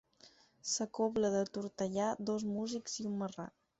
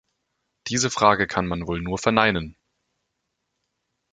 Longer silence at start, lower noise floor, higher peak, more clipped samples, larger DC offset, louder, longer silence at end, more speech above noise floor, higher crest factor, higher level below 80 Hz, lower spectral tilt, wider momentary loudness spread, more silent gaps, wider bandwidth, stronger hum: second, 0.25 s vs 0.65 s; second, -64 dBFS vs -78 dBFS; second, -22 dBFS vs -2 dBFS; neither; neither; second, -37 LUFS vs -22 LUFS; second, 0.3 s vs 1.6 s; second, 28 dB vs 56 dB; second, 16 dB vs 24 dB; second, -72 dBFS vs -48 dBFS; about the same, -5 dB/octave vs -4 dB/octave; second, 7 LU vs 11 LU; neither; second, 8 kHz vs 9.6 kHz; neither